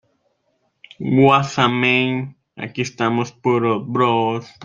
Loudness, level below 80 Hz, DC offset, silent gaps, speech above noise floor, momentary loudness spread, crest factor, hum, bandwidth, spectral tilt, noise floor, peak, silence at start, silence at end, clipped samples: -18 LUFS; -60 dBFS; under 0.1%; none; 49 dB; 14 LU; 18 dB; none; 7.6 kHz; -6 dB/octave; -67 dBFS; -2 dBFS; 1 s; 0 s; under 0.1%